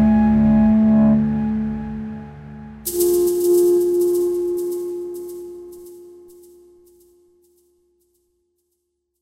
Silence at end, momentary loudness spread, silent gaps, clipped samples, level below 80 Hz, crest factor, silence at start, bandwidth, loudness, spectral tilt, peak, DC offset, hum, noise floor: 3.15 s; 22 LU; none; under 0.1%; -40 dBFS; 12 dB; 0 s; 16 kHz; -18 LUFS; -7 dB/octave; -6 dBFS; under 0.1%; none; -74 dBFS